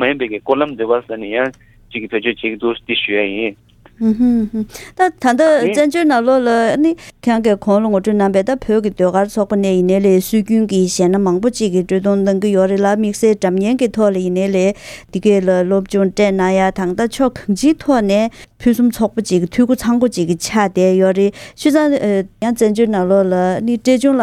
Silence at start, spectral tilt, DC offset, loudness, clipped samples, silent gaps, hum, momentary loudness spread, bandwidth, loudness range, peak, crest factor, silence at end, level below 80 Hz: 0 s; -6 dB/octave; under 0.1%; -15 LUFS; under 0.1%; none; none; 6 LU; 15 kHz; 3 LU; 0 dBFS; 14 dB; 0 s; -44 dBFS